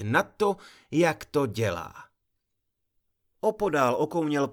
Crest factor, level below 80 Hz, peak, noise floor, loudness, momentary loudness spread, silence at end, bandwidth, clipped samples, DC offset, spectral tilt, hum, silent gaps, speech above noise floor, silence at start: 20 dB; -60 dBFS; -8 dBFS; -79 dBFS; -27 LUFS; 7 LU; 0 s; 19.5 kHz; under 0.1%; under 0.1%; -6 dB/octave; none; none; 53 dB; 0 s